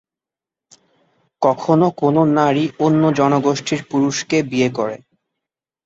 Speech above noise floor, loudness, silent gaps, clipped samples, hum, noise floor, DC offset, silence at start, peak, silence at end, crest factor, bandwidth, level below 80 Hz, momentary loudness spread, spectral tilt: 72 dB; -17 LUFS; none; under 0.1%; none; -88 dBFS; under 0.1%; 1.4 s; -2 dBFS; 0.9 s; 16 dB; 8 kHz; -60 dBFS; 6 LU; -6 dB/octave